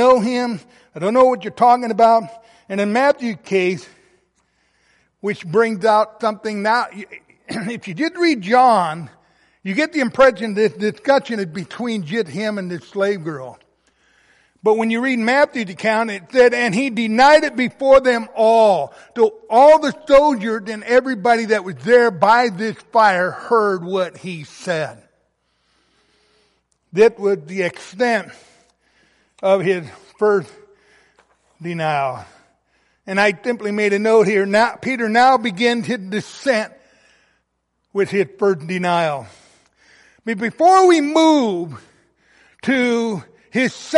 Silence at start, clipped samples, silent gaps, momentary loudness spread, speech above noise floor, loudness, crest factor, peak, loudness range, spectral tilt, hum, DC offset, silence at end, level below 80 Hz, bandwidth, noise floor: 0 s; under 0.1%; none; 14 LU; 55 dB; -17 LUFS; 16 dB; -2 dBFS; 8 LU; -5 dB/octave; none; under 0.1%; 0 s; -56 dBFS; 11.5 kHz; -71 dBFS